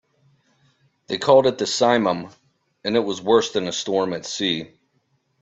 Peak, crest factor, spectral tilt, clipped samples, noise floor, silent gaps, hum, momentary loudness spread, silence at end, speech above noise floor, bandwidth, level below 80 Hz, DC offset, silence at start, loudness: -2 dBFS; 20 dB; -4 dB/octave; under 0.1%; -68 dBFS; none; none; 13 LU; 0.75 s; 48 dB; 8.2 kHz; -64 dBFS; under 0.1%; 1.1 s; -21 LUFS